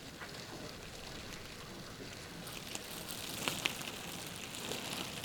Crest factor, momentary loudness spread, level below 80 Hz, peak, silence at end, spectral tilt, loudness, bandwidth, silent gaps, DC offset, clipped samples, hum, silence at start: 32 dB; 10 LU; -62 dBFS; -12 dBFS; 0 s; -2.5 dB/octave; -42 LUFS; over 20 kHz; none; under 0.1%; under 0.1%; none; 0 s